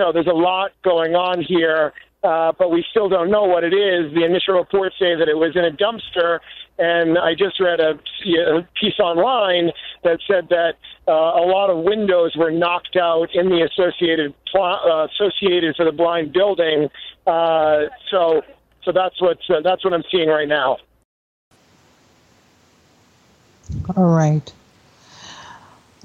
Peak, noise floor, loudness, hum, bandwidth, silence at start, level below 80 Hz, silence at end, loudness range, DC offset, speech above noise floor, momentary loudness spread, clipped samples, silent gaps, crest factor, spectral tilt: -2 dBFS; -55 dBFS; -18 LUFS; none; 7.2 kHz; 0 s; -52 dBFS; 0.45 s; 6 LU; under 0.1%; 37 dB; 5 LU; under 0.1%; 21.05-21.51 s; 16 dB; -6.5 dB/octave